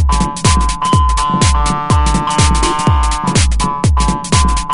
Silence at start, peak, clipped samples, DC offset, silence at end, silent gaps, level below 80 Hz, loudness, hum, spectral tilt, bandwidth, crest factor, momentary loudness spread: 0 s; 0 dBFS; under 0.1%; under 0.1%; 0 s; none; -16 dBFS; -13 LUFS; none; -4.5 dB/octave; 11 kHz; 12 dB; 2 LU